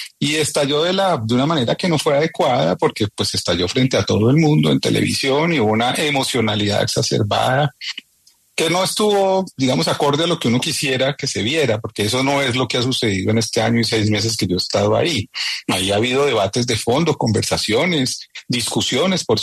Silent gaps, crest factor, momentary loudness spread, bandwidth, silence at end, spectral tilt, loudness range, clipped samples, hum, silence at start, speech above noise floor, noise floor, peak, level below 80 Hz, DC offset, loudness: none; 16 dB; 4 LU; 13.5 kHz; 0 s; -4.5 dB/octave; 2 LU; under 0.1%; none; 0 s; 39 dB; -56 dBFS; -2 dBFS; -50 dBFS; under 0.1%; -17 LUFS